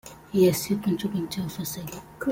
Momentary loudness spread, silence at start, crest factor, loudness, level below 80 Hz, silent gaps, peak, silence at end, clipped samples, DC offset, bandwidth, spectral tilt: 12 LU; 0.05 s; 18 dB; -26 LUFS; -56 dBFS; none; -10 dBFS; 0 s; under 0.1%; under 0.1%; 17 kHz; -5.5 dB/octave